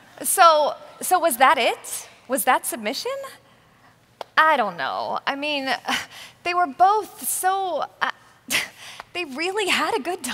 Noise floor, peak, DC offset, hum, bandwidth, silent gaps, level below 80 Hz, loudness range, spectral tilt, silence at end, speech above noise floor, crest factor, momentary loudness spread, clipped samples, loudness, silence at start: -55 dBFS; -2 dBFS; under 0.1%; none; 16 kHz; none; -70 dBFS; 4 LU; -1 dB/octave; 0 s; 33 dB; 22 dB; 14 LU; under 0.1%; -21 LUFS; 0.2 s